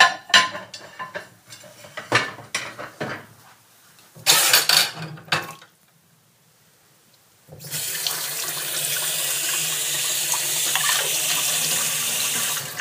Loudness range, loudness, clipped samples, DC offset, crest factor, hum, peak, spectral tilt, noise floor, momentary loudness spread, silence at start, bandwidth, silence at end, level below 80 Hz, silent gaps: 9 LU; -20 LUFS; under 0.1%; under 0.1%; 24 dB; none; 0 dBFS; 0.5 dB/octave; -58 dBFS; 20 LU; 0 s; 15.5 kHz; 0 s; -68 dBFS; none